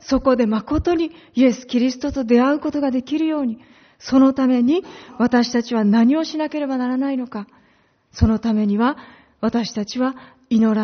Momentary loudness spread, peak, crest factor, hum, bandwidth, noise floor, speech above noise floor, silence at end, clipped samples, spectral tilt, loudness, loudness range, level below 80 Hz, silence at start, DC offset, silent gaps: 10 LU; -2 dBFS; 18 dB; none; 6.6 kHz; -58 dBFS; 40 dB; 0 s; under 0.1%; -5.5 dB/octave; -19 LUFS; 4 LU; -40 dBFS; 0.05 s; under 0.1%; none